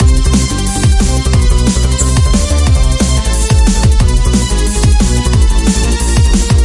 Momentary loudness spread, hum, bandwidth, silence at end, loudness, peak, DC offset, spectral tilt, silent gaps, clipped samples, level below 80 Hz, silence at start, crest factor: 2 LU; none; 11.5 kHz; 0 s; -11 LUFS; 0 dBFS; under 0.1%; -5 dB/octave; none; under 0.1%; -10 dBFS; 0 s; 8 dB